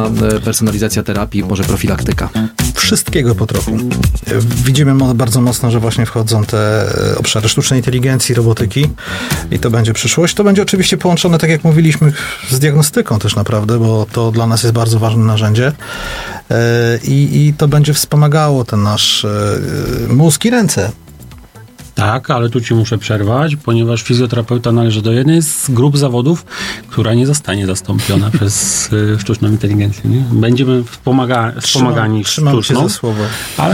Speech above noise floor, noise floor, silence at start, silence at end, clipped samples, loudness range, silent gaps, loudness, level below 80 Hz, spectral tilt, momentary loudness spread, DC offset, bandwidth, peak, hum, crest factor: 24 dB; -35 dBFS; 0 s; 0 s; under 0.1%; 3 LU; none; -12 LUFS; -32 dBFS; -5 dB/octave; 6 LU; under 0.1%; 17 kHz; 0 dBFS; none; 12 dB